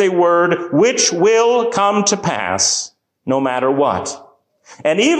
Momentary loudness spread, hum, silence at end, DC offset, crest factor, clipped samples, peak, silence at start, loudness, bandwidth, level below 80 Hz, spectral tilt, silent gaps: 10 LU; none; 0 s; under 0.1%; 12 dB; under 0.1%; -2 dBFS; 0 s; -15 LUFS; 9.8 kHz; -54 dBFS; -3 dB/octave; none